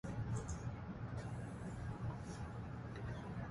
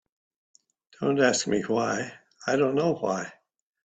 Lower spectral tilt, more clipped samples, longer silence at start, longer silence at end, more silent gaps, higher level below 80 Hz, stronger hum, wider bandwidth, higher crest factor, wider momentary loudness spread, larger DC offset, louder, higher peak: first, -7 dB/octave vs -4.5 dB/octave; neither; second, 0.05 s vs 1 s; second, 0 s vs 0.6 s; neither; first, -54 dBFS vs -68 dBFS; neither; first, 11.5 kHz vs 9 kHz; second, 14 dB vs 22 dB; second, 4 LU vs 12 LU; neither; second, -47 LUFS vs -26 LUFS; second, -32 dBFS vs -6 dBFS